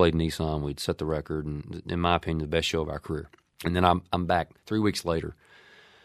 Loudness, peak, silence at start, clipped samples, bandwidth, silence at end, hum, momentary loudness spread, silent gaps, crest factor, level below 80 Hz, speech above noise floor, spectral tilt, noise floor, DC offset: -28 LUFS; -4 dBFS; 0 s; under 0.1%; 15 kHz; 0.7 s; none; 11 LU; none; 24 dB; -44 dBFS; 27 dB; -5.5 dB/octave; -55 dBFS; under 0.1%